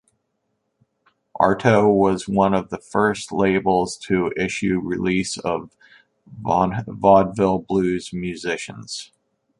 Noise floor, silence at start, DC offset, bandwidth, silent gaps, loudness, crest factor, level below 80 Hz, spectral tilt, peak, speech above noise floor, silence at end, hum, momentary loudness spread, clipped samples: -73 dBFS; 1.35 s; under 0.1%; 11.5 kHz; none; -20 LUFS; 20 dB; -50 dBFS; -6 dB/octave; -2 dBFS; 53 dB; 0.55 s; none; 12 LU; under 0.1%